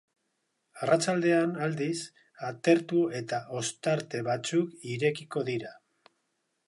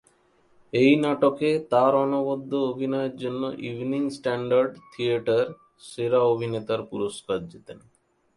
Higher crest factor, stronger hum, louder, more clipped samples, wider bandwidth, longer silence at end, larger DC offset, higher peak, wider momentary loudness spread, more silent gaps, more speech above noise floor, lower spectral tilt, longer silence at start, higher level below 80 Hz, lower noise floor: about the same, 20 dB vs 20 dB; neither; second, -29 LUFS vs -25 LUFS; neither; about the same, 11.5 kHz vs 11.5 kHz; first, 0.9 s vs 0.6 s; neither; second, -10 dBFS vs -6 dBFS; about the same, 11 LU vs 11 LU; neither; first, 50 dB vs 38 dB; second, -5 dB/octave vs -6.5 dB/octave; about the same, 0.75 s vs 0.75 s; second, -78 dBFS vs -66 dBFS; first, -79 dBFS vs -62 dBFS